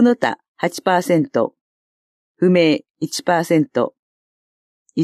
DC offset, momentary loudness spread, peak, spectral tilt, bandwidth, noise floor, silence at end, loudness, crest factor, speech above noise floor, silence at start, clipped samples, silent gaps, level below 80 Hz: under 0.1%; 10 LU; -2 dBFS; -5.5 dB/octave; 14.5 kHz; under -90 dBFS; 0 s; -19 LUFS; 16 dB; over 73 dB; 0 s; under 0.1%; 0.48-0.55 s, 1.61-2.35 s, 2.90-2.95 s, 3.99-4.86 s; -70 dBFS